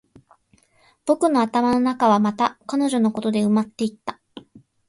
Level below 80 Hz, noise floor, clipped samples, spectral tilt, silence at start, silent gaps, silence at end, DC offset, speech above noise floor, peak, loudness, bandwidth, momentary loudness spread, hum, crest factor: -62 dBFS; -60 dBFS; under 0.1%; -6 dB/octave; 1.05 s; none; 0.3 s; under 0.1%; 40 dB; -6 dBFS; -21 LUFS; 11.5 kHz; 9 LU; none; 16 dB